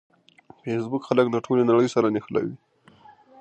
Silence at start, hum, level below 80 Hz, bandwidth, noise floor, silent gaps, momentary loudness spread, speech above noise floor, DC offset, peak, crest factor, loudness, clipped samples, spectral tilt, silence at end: 0.65 s; none; -68 dBFS; 8.6 kHz; -53 dBFS; none; 10 LU; 31 dB; under 0.1%; -4 dBFS; 20 dB; -23 LUFS; under 0.1%; -7 dB/octave; 0.85 s